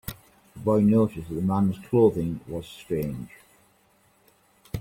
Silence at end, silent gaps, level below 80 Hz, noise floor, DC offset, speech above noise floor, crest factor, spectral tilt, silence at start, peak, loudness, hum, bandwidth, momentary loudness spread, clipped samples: 0 s; none; -52 dBFS; -63 dBFS; under 0.1%; 39 dB; 18 dB; -8.5 dB/octave; 0.05 s; -8 dBFS; -25 LUFS; none; 16.5 kHz; 17 LU; under 0.1%